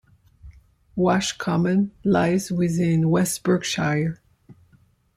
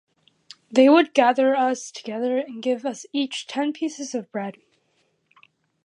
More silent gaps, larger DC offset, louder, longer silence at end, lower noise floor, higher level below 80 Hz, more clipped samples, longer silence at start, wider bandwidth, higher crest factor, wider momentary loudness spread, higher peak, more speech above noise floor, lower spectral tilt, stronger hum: neither; neither; about the same, -22 LUFS vs -22 LUFS; second, 0.65 s vs 1.35 s; second, -59 dBFS vs -68 dBFS; first, -52 dBFS vs -82 dBFS; neither; second, 0.45 s vs 0.7 s; first, 15.5 kHz vs 10.5 kHz; about the same, 16 dB vs 20 dB; second, 5 LU vs 15 LU; about the same, -6 dBFS vs -4 dBFS; second, 38 dB vs 47 dB; first, -5.5 dB/octave vs -3.5 dB/octave; neither